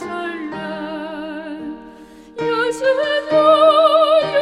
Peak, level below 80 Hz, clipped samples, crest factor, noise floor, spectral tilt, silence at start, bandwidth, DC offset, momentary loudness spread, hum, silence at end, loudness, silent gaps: -2 dBFS; -58 dBFS; under 0.1%; 16 dB; -40 dBFS; -4.5 dB/octave; 0 s; 11.5 kHz; under 0.1%; 19 LU; none; 0 s; -16 LUFS; none